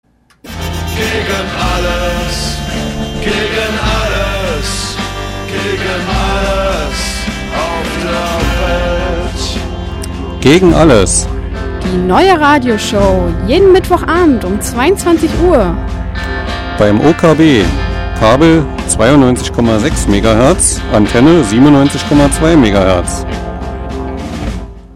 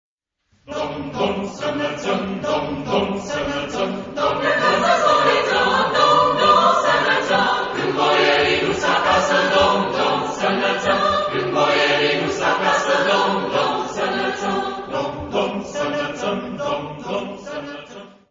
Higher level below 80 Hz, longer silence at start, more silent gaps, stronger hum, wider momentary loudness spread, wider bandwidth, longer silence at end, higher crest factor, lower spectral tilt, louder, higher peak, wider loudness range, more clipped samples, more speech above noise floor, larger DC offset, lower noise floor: first, -20 dBFS vs -50 dBFS; second, 0.45 s vs 0.7 s; neither; neither; first, 13 LU vs 10 LU; first, 15.5 kHz vs 7.6 kHz; second, 0 s vs 0.2 s; second, 10 dB vs 16 dB; about the same, -5 dB/octave vs -4 dB/octave; first, -11 LUFS vs -19 LUFS; about the same, 0 dBFS vs -2 dBFS; about the same, 7 LU vs 8 LU; neither; second, 23 dB vs 43 dB; neither; second, -32 dBFS vs -64 dBFS